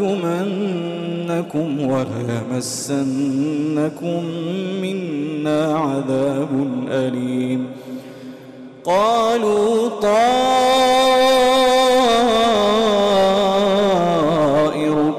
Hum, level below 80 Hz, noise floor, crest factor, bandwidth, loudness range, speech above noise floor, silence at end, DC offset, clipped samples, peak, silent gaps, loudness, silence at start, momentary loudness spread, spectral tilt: none; -52 dBFS; -38 dBFS; 8 dB; 15.5 kHz; 8 LU; 19 dB; 0 s; under 0.1%; under 0.1%; -10 dBFS; none; -17 LUFS; 0 s; 10 LU; -5 dB/octave